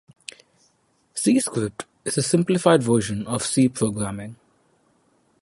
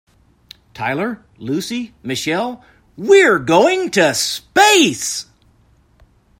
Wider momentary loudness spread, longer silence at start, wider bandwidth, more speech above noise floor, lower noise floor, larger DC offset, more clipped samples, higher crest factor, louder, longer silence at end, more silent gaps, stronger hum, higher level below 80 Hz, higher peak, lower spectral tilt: first, 19 LU vs 15 LU; first, 1.15 s vs 0.75 s; second, 11.5 kHz vs 16.5 kHz; first, 44 dB vs 38 dB; first, -65 dBFS vs -54 dBFS; neither; neither; about the same, 22 dB vs 18 dB; second, -22 LUFS vs -15 LUFS; about the same, 1.1 s vs 1.15 s; neither; neither; about the same, -56 dBFS vs -56 dBFS; about the same, -2 dBFS vs 0 dBFS; first, -5 dB/octave vs -3 dB/octave